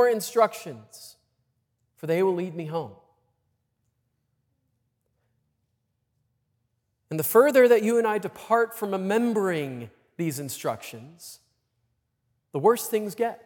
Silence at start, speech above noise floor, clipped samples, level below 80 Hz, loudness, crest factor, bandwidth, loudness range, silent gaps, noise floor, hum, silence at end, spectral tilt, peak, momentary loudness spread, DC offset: 0 s; 52 dB; under 0.1%; -80 dBFS; -24 LUFS; 20 dB; 18 kHz; 11 LU; none; -76 dBFS; none; 0.1 s; -5 dB/octave; -6 dBFS; 23 LU; under 0.1%